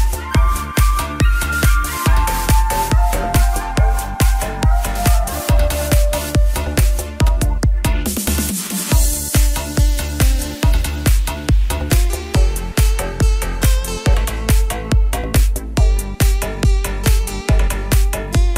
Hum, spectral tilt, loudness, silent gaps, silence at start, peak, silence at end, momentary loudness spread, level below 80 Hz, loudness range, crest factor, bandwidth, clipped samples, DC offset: none; -4.5 dB/octave; -17 LUFS; none; 0 s; -2 dBFS; 0 s; 2 LU; -16 dBFS; 1 LU; 14 dB; 16.5 kHz; under 0.1%; under 0.1%